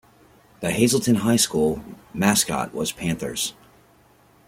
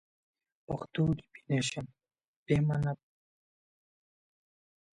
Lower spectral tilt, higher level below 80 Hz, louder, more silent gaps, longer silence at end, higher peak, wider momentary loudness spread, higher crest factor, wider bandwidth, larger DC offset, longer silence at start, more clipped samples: second, -4 dB/octave vs -6 dB/octave; first, -52 dBFS vs -58 dBFS; first, -22 LUFS vs -33 LUFS; second, none vs 2.28-2.46 s; second, 0.95 s vs 2 s; first, -4 dBFS vs -16 dBFS; second, 10 LU vs 13 LU; about the same, 20 dB vs 20 dB; first, 16.5 kHz vs 10.5 kHz; neither; about the same, 0.6 s vs 0.7 s; neither